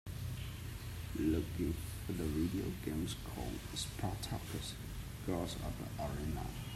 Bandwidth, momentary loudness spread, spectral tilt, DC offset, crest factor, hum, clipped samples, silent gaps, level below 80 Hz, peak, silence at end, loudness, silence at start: 16 kHz; 8 LU; -5.5 dB/octave; under 0.1%; 18 dB; none; under 0.1%; none; -50 dBFS; -22 dBFS; 0 s; -41 LUFS; 0.05 s